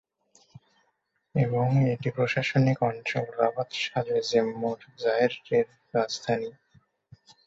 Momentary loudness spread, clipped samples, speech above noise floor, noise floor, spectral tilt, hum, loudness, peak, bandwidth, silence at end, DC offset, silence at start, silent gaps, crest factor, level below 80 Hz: 7 LU; under 0.1%; 49 dB; -75 dBFS; -6 dB/octave; none; -27 LUFS; -8 dBFS; 7.8 kHz; 0.95 s; under 0.1%; 1.35 s; none; 20 dB; -66 dBFS